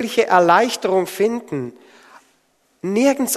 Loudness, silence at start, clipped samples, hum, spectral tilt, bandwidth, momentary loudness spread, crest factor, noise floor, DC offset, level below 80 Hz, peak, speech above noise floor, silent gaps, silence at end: -17 LUFS; 0 s; under 0.1%; none; -4 dB/octave; 13.5 kHz; 15 LU; 18 dB; -62 dBFS; under 0.1%; -64 dBFS; 0 dBFS; 45 dB; none; 0 s